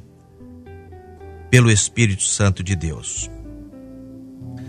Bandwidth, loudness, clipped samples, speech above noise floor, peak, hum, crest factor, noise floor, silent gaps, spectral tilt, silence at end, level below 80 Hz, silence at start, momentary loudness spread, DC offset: 13 kHz; -18 LUFS; under 0.1%; 26 dB; 0 dBFS; none; 22 dB; -44 dBFS; none; -4 dB/octave; 0 s; -40 dBFS; 0.4 s; 26 LU; under 0.1%